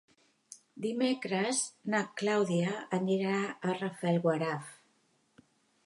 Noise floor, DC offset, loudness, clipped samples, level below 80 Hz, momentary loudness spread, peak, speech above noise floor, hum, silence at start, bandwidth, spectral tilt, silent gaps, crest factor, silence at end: -72 dBFS; under 0.1%; -32 LUFS; under 0.1%; -82 dBFS; 11 LU; -16 dBFS; 40 dB; none; 0.5 s; 11.5 kHz; -5 dB/octave; none; 18 dB; 1.1 s